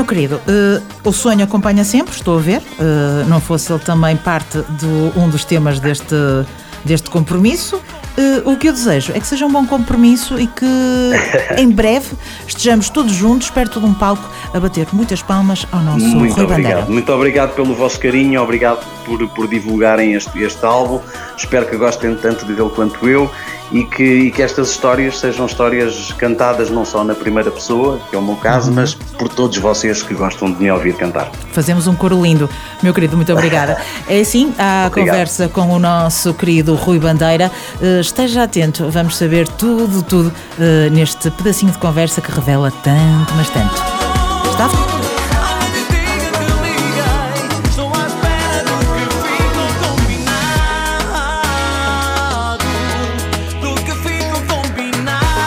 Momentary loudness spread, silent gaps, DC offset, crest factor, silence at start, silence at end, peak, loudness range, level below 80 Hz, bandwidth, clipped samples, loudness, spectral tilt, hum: 6 LU; none; under 0.1%; 14 dB; 0 s; 0 s; 0 dBFS; 3 LU; -28 dBFS; 19 kHz; under 0.1%; -14 LUFS; -5.5 dB/octave; none